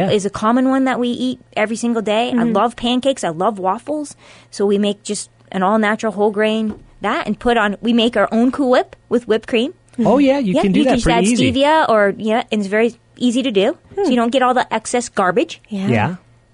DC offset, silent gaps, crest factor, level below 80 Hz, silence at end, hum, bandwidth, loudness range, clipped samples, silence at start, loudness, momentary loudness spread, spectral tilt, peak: under 0.1%; none; 12 dB; -42 dBFS; 0.35 s; none; 11 kHz; 4 LU; under 0.1%; 0 s; -17 LUFS; 8 LU; -5 dB/octave; -4 dBFS